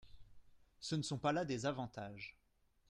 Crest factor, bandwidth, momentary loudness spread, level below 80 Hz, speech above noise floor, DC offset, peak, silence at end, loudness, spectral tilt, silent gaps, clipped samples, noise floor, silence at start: 20 dB; 11.5 kHz; 13 LU; -68 dBFS; 21 dB; under 0.1%; -24 dBFS; 0.6 s; -41 LUFS; -5 dB/octave; none; under 0.1%; -62 dBFS; 0.05 s